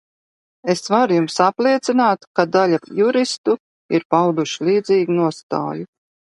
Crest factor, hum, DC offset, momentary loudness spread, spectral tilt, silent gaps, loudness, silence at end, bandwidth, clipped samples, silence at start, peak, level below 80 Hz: 18 dB; none; under 0.1%; 8 LU; -5.5 dB/octave; 2.27-2.34 s, 3.38-3.44 s, 3.60-3.89 s, 4.05-4.10 s, 5.43-5.49 s; -18 LUFS; 0.55 s; 11.5 kHz; under 0.1%; 0.65 s; 0 dBFS; -68 dBFS